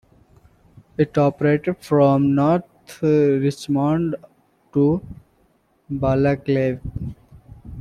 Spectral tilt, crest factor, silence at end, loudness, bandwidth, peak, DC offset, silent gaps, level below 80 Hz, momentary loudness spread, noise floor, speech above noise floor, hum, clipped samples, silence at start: -8.5 dB/octave; 16 dB; 0 s; -20 LUFS; 12 kHz; -4 dBFS; under 0.1%; none; -46 dBFS; 15 LU; -61 dBFS; 43 dB; none; under 0.1%; 1 s